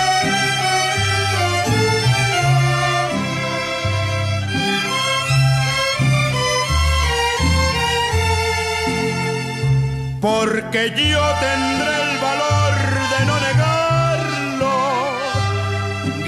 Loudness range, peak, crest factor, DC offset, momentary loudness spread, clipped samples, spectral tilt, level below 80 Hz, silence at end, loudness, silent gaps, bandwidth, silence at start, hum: 2 LU; -6 dBFS; 12 dB; under 0.1%; 5 LU; under 0.1%; -4.5 dB/octave; -32 dBFS; 0 s; -17 LUFS; none; 14.5 kHz; 0 s; none